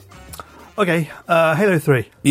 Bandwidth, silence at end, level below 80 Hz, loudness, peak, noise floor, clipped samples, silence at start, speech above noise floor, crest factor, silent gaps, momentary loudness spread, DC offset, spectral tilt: 16 kHz; 0 s; -52 dBFS; -17 LUFS; -2 dBFS; -38 dBFS; under 0.1%; 0.3 s; 21 dB; 16 dB; none; 21 LU; under 0.1%; -6 dB/octave